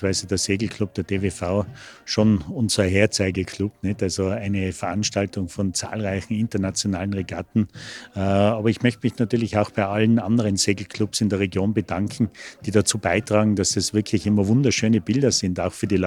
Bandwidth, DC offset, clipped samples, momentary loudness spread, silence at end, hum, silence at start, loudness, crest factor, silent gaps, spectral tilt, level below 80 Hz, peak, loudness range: 14.5 kHz; under 0.1%; under 0.1%; 7 LU; 0 s; none; 0 s; -22 LUFS; 18 dB; none; -5 dB/octave; -54 dBFS; -4 dBFS; 4 LU